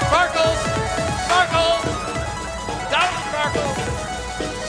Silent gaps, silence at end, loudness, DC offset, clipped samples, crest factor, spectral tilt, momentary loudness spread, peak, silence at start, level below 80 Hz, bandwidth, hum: none; 0 s; -21 LUFS; under 0.1%; under 0.1%; 18 dB; -3.5 dB/octave; 10 LU; -4 dBFS; 0 s; -36 dBFS; 11 kHz; none